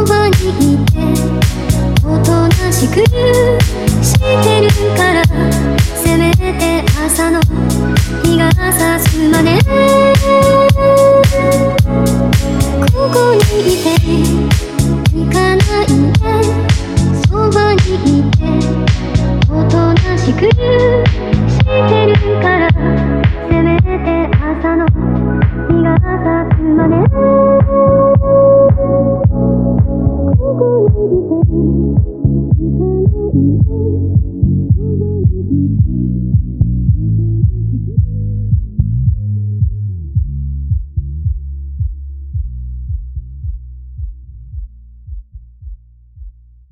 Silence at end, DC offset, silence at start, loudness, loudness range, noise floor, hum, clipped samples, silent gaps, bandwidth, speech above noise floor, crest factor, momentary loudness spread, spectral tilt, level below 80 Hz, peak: 0.4 s; under 0.1%; 0 s; -12 LUFS; 10 LU; -36 dBFS; none; under 0.1%; none; 16 kHz; 26 dB; 12 dB; 10 LU; -6.5 dB/octave; -20 dBFS; 0 dBFS